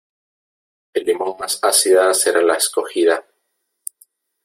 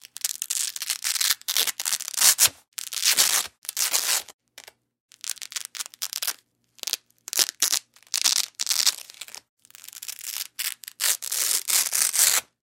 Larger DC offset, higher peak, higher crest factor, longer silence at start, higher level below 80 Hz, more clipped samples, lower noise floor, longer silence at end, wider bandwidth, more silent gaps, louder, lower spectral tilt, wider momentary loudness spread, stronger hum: neither; about the same, -2 dBFS vs 0 dBFS; second, 16 dB vs 26 dB; first, 0.95 s vs 0.25 s; first, -68 dBFS vs -76 dBFS; neither; first, -72 dBFS vs -57 dBFS; first, 1.25 s vs 0.2 s; about the same, 16.5 kHz vs 17 kHz; second, none vs 2.68-2.72 s, 3.58-3.62 s, 4.34-4.39 s, 5.00-5.09 s, 9.49-9.57 s; first, -16 LUFS vs -22 LUFS; first, 0 dB/octave vs 3.5 dB/octave; first, 20 LU vs 16 LU; neither